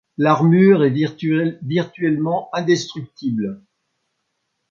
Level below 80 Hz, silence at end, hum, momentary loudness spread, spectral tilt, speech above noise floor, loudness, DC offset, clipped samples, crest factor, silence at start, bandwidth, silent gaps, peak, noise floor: -64 dBFS; 1.15 s; none; 12 LU; -7 dB/octave; 56 dB; -18 LUFS; under 0.1%; under 0.1%; 16 dB; 0.2 s; 7.4 kHz; none; -2 dBFS; -73 dBFS